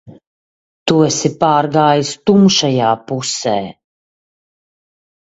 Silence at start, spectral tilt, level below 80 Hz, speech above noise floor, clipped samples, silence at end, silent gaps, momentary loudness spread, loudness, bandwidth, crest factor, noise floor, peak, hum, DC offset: 0.05 s; -4.5 dB/octave; -56 dBFS; over 77 dB; under 0.1%; 1.5 s; 0.27-0.86 s; 9 LU; -14 LUFS; 8.2 kHz; 16 dB; under -90 dBFS; 0 dBFS; none; under 0.1%